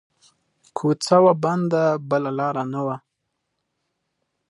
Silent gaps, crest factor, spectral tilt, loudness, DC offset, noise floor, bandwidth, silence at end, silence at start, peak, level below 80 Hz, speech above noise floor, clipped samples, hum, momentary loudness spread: none; 20 dB; -6.5 dB/octave; -21 LUFS; under 0.1%; -77 dBFS; 11.5 kHz; 1.5 s; 0.75 s; -2 dBFS; -72 dBFS; 57 dB; under 0.1%; none; 12 LU